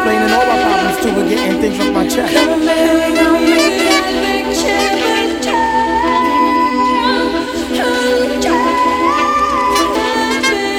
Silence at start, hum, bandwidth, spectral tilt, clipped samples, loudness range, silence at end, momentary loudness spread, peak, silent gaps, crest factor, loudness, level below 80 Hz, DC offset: 0 s; none; 16.5 kHz; -3.5 dB/octave; under 0.1%; 1 LU; 0 s; 4 LU; 0 dBFS; none; 12 dB; -13 LUFS; -38 dBFS; under 0.1%